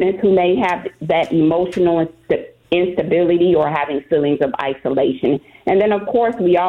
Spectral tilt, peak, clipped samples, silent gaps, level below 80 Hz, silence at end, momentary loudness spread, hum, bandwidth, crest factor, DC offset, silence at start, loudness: -8 dB/octave; -4 dBFS; under 0.1%; none; -50 dBFS; 0 s; 7 LU; none; 7 kHz; 12 dB; under 0.1%; 0 s; -17 LUFS